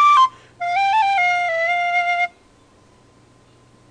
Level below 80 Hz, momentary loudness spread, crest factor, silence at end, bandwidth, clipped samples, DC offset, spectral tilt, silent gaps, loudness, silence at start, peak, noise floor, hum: -64 dBFS; 7 LU; 14 dB; 1.65 s; 10 kHz; under 0.1%; under 0.1%; -1 dB/octave; none; -18 LUFS; 0 s; -6 dBFS; -52 dBFS; none